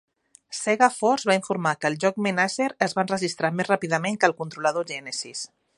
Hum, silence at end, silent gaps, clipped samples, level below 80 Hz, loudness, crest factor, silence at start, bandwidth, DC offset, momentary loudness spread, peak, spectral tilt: none; 0.3 s; none; under 0.1%; -72 dBFS; -24 LUFS; 22 dB; 0.5 s; 11.5 kHz; under 0.1%; 10 LU; -2 dBFS; -4 dB/octave